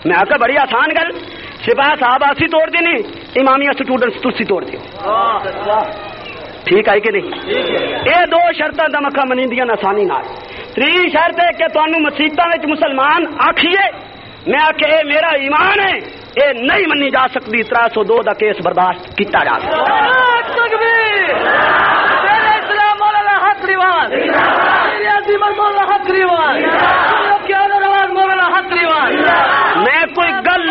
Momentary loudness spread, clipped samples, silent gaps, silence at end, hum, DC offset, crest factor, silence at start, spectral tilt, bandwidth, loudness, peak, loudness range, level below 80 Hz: 7 LU; under 0.1%; none; 0 s; none; under 0.1%; 12 dB; 0 s; -0.5 dB/octave; 5.8 kHz; -12 LUFS; 0 dBFS; 3 LU; -48 dBFS